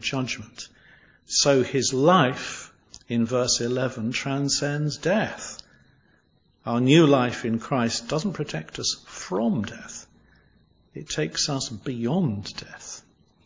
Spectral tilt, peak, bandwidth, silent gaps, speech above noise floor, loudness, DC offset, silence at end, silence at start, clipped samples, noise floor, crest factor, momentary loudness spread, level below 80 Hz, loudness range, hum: -4.5 dB/octave; -4 dBFS; 7.8 kHz; none; 40 dB; -24 LUFS; under 0.1%; 0.45 s; 0 s; under 0.1%; -64 dBFS; 20 dB; 20 LU; -56 dBFS; 6 LU; none